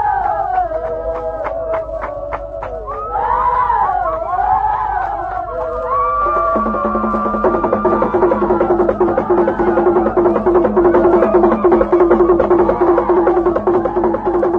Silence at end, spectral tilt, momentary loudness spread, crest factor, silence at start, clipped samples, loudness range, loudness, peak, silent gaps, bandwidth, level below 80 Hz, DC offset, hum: 0 s; -9.5 dB/octave; 10 LU; 14 dB; 0 s; under 0.1%; 6 LU; -15 LUFS; 0 dBFS; none; 4.2 kHz; -34 dBFS; under 0.1%; none